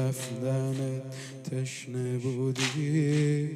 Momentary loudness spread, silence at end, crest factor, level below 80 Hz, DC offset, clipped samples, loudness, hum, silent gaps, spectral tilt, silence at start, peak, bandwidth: 10 LU; 0 s; 16 dB; -74 dBFS; under 0.1%; under 0.1%; -30 LUFS; none; none; -6 dB/octave; 0 s; -14 dBFS; 13.5 kHz